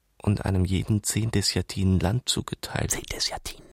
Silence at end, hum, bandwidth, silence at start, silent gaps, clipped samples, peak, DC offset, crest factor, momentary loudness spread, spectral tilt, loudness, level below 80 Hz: 0.15 s; none; 16.5 kHz; 0.25 s; none; under 0.1%; -8 dBFS; under 0.1%; 18 dB; 4 LU; -4.5 dB/octave; -26 LUFS; -42 dBFS